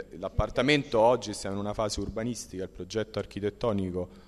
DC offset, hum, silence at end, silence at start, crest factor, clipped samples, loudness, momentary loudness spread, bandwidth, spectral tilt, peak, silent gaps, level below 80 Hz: under 0.1%; none; 0.05 s; 0 s; 20 dB; under 0.1%; -29 LUFS; 11 LU; 13.5 kHz; -5 dB/octave; -8 dBFS; none; -46 dBFS